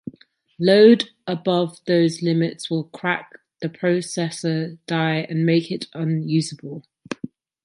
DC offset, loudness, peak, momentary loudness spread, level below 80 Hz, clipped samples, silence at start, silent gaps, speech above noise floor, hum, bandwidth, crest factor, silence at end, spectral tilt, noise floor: under 0.1%; -21 LUFS; -2 dBFS; 18 LU; -70 dBFS; under 0.1%; 0.05 s; none; 34 dB; none; 11 kHz; 18 dB; 0.4 s; -6 dB/octave; -54 dBFS